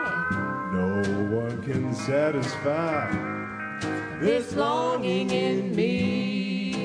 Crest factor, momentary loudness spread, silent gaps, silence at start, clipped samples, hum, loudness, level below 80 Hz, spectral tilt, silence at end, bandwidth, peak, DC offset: 16 dB; 6 LU; none; 0 s; under 0.1%; none; -26 LUFS; -58 dBFS; -6 dB/octave; 0 s; 10.5 kHz; -10 dBFS; under 0.1%